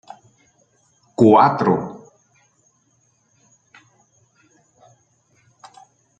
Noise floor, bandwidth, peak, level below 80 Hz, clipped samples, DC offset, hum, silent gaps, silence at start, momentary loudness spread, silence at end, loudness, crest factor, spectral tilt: -63 dBFS; 8.6 kHz; -2 dBFS; -64 dBFS; under 0.1%; under 0.1%; none; none; 1.2 s; 22 LU; 4.2 s; -15 LUFS; 22 dB; -8 dB/octave